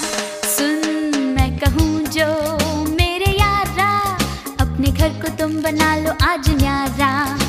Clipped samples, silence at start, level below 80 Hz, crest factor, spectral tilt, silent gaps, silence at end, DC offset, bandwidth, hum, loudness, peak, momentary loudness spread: under 0.1%; 0 s; -26 dBFS; 16 dB; -4.5 dB/octave; none; 0 s; under 0.1%; 15.5 kHz; none; -18 LUFS; 0 dBFS; 5 LU